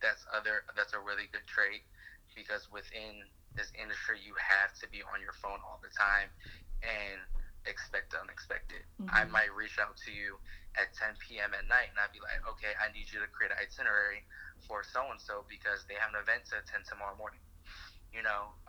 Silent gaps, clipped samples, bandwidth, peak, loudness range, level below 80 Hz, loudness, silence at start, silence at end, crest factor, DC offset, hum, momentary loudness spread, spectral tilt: none; under 0.1%; over 20 kHz; -12 dBFS; 4 LU; -50 dBFS; -35 LUFS; 0 s; 0 s; 24 dB; under 0.1%; none; 18 LU; -3 dB/octave